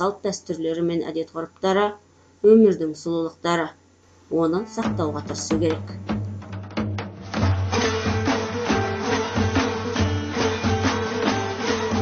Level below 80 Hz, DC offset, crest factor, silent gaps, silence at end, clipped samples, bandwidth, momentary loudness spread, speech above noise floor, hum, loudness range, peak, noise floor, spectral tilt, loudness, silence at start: -46 dBFS; under 0.1%; 18 dB; none; 0 s; under 0.1%; 8.8 kHz; 8 LU; 32 dB; none; 5 LU; -4 dBFS; -54 dBFS; -5.5 dB/octave; -23 LUFS; 0 s